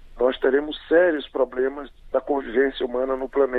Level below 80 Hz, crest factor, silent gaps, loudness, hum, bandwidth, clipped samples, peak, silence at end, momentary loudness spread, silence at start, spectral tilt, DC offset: -46 dBFS; 18 dB; none; -23 LUFS; none; 4.5 kHz; under 0.1%; -6 dBFS; 0 s; 8 LU; 0 s; -6.5 dB/octave; under 0.1%